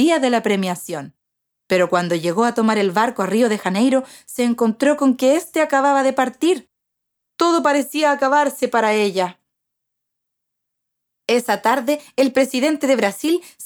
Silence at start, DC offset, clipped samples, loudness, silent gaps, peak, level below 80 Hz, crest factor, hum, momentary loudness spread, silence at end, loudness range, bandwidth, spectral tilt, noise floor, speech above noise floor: 0 s; under 0.1%; under 0.1%; -18 LUFS; none; -2 dBFS; -70 dBFS; 16 dB; none; 6 LU; 0 s; 4 LU; over 20 kHz; -4.5 dB/octave; -78 dBFS; 61 dB